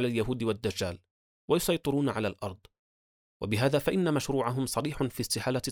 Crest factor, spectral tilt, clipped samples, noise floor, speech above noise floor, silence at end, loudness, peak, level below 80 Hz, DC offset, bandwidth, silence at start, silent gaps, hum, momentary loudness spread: 18 dB; -5 dB/octave; under 0.1%; under -90 dBFS; over 61 dB; 0 s; -30 LUFS; -14 dBFS; -54 dBFS; under 0.1%; over 20 kHz; 0 s; 1.11-1.48 s, 2.79-3.40 s; none; 9 LU